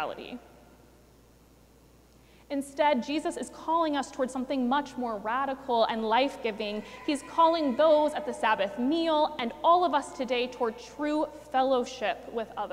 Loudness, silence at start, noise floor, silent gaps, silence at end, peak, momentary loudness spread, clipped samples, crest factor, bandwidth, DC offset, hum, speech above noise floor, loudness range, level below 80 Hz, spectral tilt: -28 LUFS; 0 s; -58 dBFS; none; 0 s; -12 dBFS; 11 LU; under 0.1%; 18 dB; 15.5 kHz; under 0.1%; none; 30 dB; 6 LU; -62 dBFS; -4 dB/octave